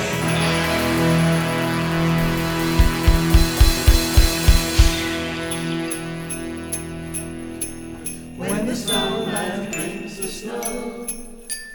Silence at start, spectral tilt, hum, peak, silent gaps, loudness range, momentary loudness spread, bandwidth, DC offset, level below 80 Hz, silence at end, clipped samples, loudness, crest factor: 0 s; -4.5 dB/octave; none; 0 dBFS; none; 9 LU; 12 LU; over 20 kHz; under 0.1%; -24 dBFS; 0 s; under 0.1%; -21 LUFS; 18 dB